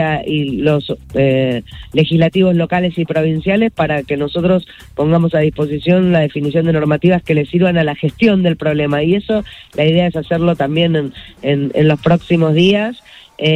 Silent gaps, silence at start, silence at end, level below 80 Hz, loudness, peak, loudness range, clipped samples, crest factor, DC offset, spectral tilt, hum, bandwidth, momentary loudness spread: none; 0 s; 0 s; -42 dBFS; -14 LUFS; 0 dBFS; 1 LU; under 0.1%; 14 dB; under 0.1%; -8 dB/octave; none; 7.8 kHz; 7 LU